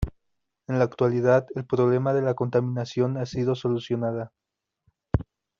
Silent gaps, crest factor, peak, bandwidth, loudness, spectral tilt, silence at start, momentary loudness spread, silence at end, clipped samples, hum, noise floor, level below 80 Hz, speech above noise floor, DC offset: none; 20 dB; -6 dBFS; 7.2 kHz; -25 LUFS; -7.5 dB/octave; 0 s; 8 LU; 0.4 s; under 0.1%; none; -79 dBFS; -44 dBFS; 55 dB; under 0.1%